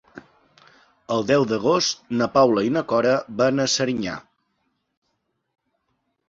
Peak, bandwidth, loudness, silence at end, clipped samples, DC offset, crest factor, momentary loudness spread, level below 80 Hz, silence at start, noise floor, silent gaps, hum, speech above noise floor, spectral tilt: -4 dBFS; 8 kHz; -21 LUFS; 2.1 s; under 0.1%; under 0.1%; 20 dB; 9 LU; -60 dBFS; 0.15 s; -74 dBFS; none; none; 53 dB; -4.5 dB/octave